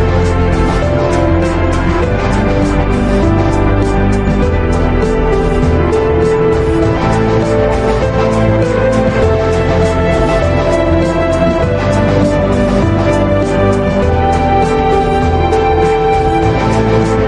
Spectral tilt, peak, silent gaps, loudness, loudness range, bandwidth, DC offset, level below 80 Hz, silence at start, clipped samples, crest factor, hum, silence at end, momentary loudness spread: -7.5 dB/octave; 0 dBFS; none; -12 LUFS; 1 LU; 11 kHz; under 0.1%; -20 dBFS; 0 s; under 0.1%; 10 dB; none; 0 s; 2 LU